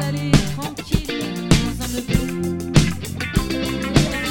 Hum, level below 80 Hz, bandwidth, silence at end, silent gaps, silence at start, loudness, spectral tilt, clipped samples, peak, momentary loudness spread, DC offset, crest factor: none; -30 dBFS; 17.5 kHz; 0 s; none; 0 s; -21 LUFS; -5 dB/octave; under 0.1%; 0 dBFS; 7 LU; under 0.1%; 20 dB